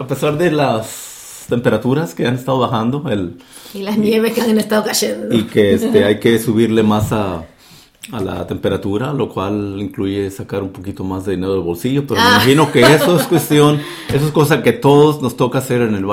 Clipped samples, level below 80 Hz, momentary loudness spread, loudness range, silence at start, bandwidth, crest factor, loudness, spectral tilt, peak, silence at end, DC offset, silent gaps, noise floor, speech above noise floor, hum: under 0.1%; -46 dBFS; 13 LU; 8 LU; 0 s; 16.5 kHz; 14 dB; -15 LUFS; -5.5 dB/octave; 0 dBFS; 0 s; under 0.1%; none; -44 dBFS; 30 dB; none